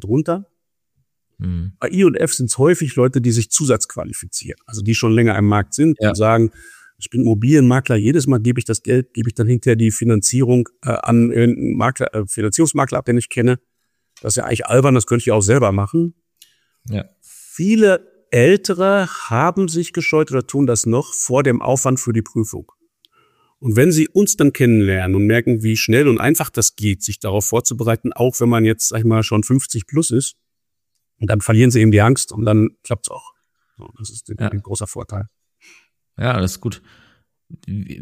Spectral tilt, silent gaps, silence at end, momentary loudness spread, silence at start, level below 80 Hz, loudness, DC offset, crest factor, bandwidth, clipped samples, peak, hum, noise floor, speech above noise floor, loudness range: -5.5 dB/octave; none; 0 s; 12 LU; 0 s; -48 dBFS; -16 LUFS; under 0.1%; 16 dB; 15.5 kHz; under 0.1%; 0 dBFS; none; -80 dBFS; 65 dB; 3 LU